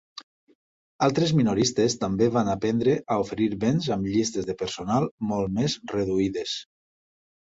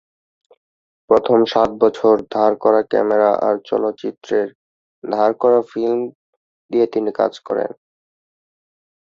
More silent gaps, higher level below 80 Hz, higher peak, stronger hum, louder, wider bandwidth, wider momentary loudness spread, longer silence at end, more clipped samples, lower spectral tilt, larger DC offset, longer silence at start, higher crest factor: second, 0.23-0.47 s, 0.55-0.99 s, 5.11-5.18 s vs 4.55-5.02 s, 6.15-6.69 s; first, -54 dBFS vs -60 dBFS; second, -8 dBFS vs -2 dBFS; neither; second, -25 LUFS vs -17 LUFS; first, 8 kHz vs 7.2 kHz; about the same, 8 LU vs 9 LU; second, 0.9 s vs 1.35 s; neither; about the same, -5.5 dB/octave vs -6.5 dB/octave; neither; second, 0.15 s vs 1.1 s; about the same, 18 dB vs 18 dB